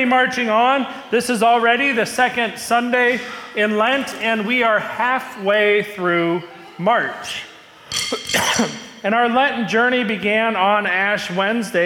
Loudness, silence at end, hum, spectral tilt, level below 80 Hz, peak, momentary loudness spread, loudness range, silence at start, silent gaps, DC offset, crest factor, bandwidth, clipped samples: -18 LUFS; 0 s; none; -3.5 dB/octave; -62 dBFS; -6 dBFS; 8 LU; 3 LU; 0 s; none; under 0.1%; 12 dB; 18 kHz; under 0.1%